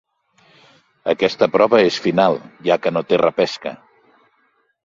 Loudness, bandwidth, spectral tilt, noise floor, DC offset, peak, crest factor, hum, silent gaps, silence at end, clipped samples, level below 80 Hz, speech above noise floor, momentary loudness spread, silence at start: -17 LUFS; 7.6 kHz; -5.5 dB/octave; -63 dBFS; under 0.1%; 0 dBFS; 18 dB; none; none; 1.1 s; under 0.1%; -60 dBFS; 46 dB; 10 LU; 1.05 s